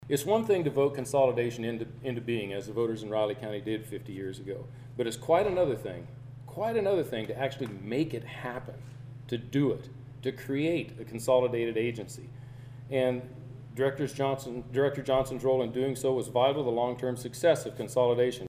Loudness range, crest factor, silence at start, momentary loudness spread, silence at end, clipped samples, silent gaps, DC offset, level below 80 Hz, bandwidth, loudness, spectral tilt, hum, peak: 5 LU; 18 dB; 0 s; 16 LU; 0 s; under 0.1%; none; under 0.1%; -60 dBFS; 15.5 kHz; -30 LUFS; -6 dB/octave; none; -12 dBFS